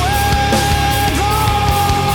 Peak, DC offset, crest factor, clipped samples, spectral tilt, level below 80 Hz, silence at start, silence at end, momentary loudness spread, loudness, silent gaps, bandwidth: -4 dBFS; under 0.1%; 10 dB; under 0.1%; -4 dB/octave; -22 dBFS; 0 s; 0 s; 1 LU; -14 LUFS; none; over 20 kHz